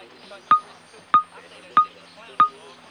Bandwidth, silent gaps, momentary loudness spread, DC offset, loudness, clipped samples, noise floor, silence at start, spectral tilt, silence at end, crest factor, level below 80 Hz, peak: 9.6 kHz; none; 9 LU; under 0.1%; -21 LUFS; under 0.1%; -47 dBFS; 0.3 s; -3.5 dB/octave; 0.4 s; 20 dB; -68 dBFS; -4 dBFS